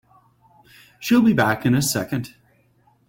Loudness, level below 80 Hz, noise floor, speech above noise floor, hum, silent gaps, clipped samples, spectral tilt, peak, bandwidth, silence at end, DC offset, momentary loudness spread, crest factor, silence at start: -20 LUFS; -56 dBFS; -60 dBFS; 41 dB; none; none; under 0.1%; -5 dB/octave; -4 dBFS; 17 kHz; 0.8 s; under 0.1%; 14 LU; 18 dB; 1 s